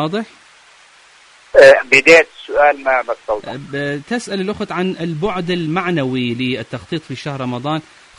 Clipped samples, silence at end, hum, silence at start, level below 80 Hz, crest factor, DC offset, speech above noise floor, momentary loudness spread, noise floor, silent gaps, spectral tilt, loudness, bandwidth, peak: 0.2%; 0.35 s; none; 0 s; -50 dBFS; 16 dB; under 0.1%; 31 dB; 17 LU; -46 dBFS; none; -5 dB/octave; -15 LUFS; 11 kHz; 0 dBFS